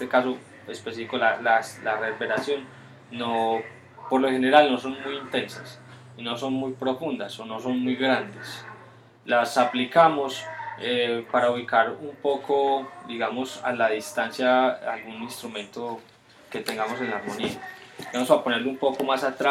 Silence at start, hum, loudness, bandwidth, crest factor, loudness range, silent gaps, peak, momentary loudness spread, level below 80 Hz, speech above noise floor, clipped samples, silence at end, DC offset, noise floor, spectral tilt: 0 s; none; -25 LUFS; 16 kHz; 22 dB; 5 LU; none; -4 dBFS; 16 LU; -72 dBFS; 25 dB; under 0.1%; 0 s; under 0.1%; -49 dBFS; -4 dB/octave